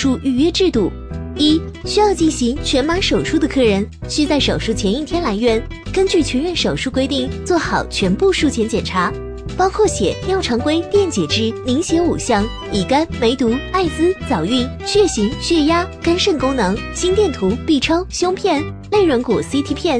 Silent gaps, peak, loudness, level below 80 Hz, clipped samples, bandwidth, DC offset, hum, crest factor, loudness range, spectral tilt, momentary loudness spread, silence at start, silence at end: none; -2 dBFS; -17 LUFS; -32 dBFS; under 0.1%; 10.5 kHz; under 0.1%; none; 14 dB; 1 LU; -4.5 dB/octave; 5 LU; 0 s; 0 s